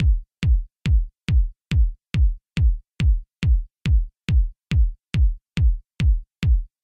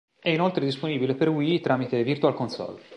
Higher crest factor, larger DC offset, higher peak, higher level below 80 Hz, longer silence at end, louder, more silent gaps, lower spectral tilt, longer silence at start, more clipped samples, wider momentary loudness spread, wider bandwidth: second, 10 dB vs 18 dB; neither; second, -10 dBFS vs -6 dBFS; first, -20 dBFS vs -68 dBFS; first, 0.2 s vs 0 s; about the same, -23 LUFS vs -25 LUFS; neither; about the same, -7 dB/octave vs -7.5 dB/octave; second, 0 s vs 0.25 s; neither; second, 1 LU vs 6 LU; second, 8.2 kHz vs 10 kHz